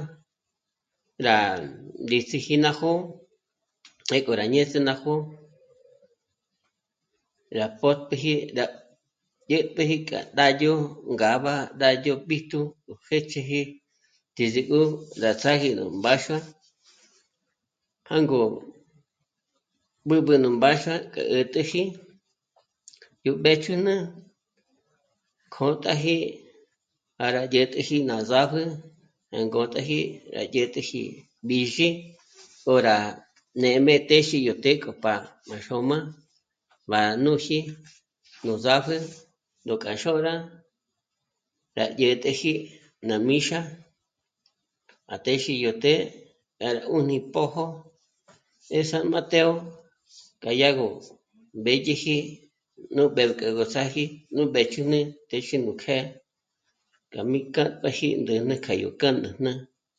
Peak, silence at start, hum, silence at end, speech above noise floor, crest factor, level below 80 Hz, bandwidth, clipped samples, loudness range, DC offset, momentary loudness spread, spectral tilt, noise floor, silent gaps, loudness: -2 dBFS; 0 s; none; 0.35 s; 60 dB; 24 dB; -68 dBFS; 9.2 kHz; under 0.1%; 5 LU; under 0.1%; 13 LU; -5 dB/octave; -84 dBFS; none; -24 LUFS